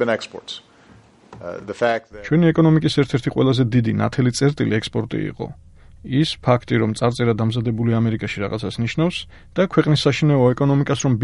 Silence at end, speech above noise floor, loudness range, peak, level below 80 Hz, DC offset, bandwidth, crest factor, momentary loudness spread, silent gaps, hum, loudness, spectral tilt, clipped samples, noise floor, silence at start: 0 s; 30 dB; 3 LU; -2 dBFS; -46 dBFS; under 0.1%; 11.5 kHz; 18 dB; 14 LU; none; none; -19 LUFS; -6.5 dB/octave; under 0.1%; -49 dBFS; 0 s